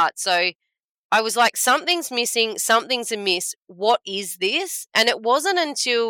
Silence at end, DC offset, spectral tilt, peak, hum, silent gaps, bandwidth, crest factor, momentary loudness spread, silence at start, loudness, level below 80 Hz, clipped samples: 0 s; under 0.1%; -0.5 dB/octave; -4 dBFS; none; 0.55-0.59 s, 0.84-1.10 s; 18 kHz; 16 dB; 6 LU; 0 s; -20 LUFS; -86 dBFS; under 0.1%